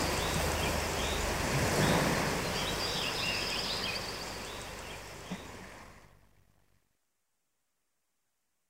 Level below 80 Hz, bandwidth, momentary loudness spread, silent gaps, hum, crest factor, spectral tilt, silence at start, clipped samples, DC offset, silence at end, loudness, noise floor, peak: -46 dBFS; 16 kHz; 15 LU; none; none; 20 dB; -3.5 dB/octave; 0 s; under 0.1%; under 0.1%; 2.65 s; -32 LUFS; -83 dBFS; -14 dBFS